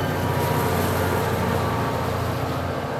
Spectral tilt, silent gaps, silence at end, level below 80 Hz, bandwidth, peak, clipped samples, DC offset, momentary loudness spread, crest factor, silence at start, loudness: -6 dB/octave; none; 0 s; -46 dBFS; 16.5 kHz; -10 dBFS; under 0.1%; under 0.1%; 4 LU; 14 dB; 0 s; -23 LUFS